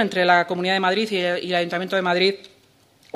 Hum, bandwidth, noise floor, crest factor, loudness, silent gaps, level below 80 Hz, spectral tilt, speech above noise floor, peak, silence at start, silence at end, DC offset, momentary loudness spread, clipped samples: none; 13.5 kHz; -57 dBFS; 20 dB; -20 LUFS; none; -70 dBFS; -5 dB/octave; 36 dB; -2 dBFS; 0 s; 0.7 s; under 0.1%; 5 LU; under 0.1%